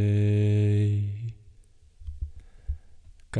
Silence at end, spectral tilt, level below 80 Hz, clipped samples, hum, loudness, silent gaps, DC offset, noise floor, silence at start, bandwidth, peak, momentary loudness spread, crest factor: 0 s; -9 dB/octave; -42 dBFS; under 0.1%; none; -25 LUFS; none; under 0.1%; -54 dBFS; 0 s; 9.2 kHz; -14 dBFS; 21 LU; 12 dB